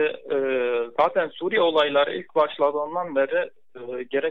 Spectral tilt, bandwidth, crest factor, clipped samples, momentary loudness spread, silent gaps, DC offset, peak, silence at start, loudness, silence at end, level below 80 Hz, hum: -6 dB/octave; 5.2 kHz; 16 dB; under 0.1%; 8 LU; none; 0.3%; -8 dBFS; 0 s; -23 LUFS; 0 s; -74 dBFS; none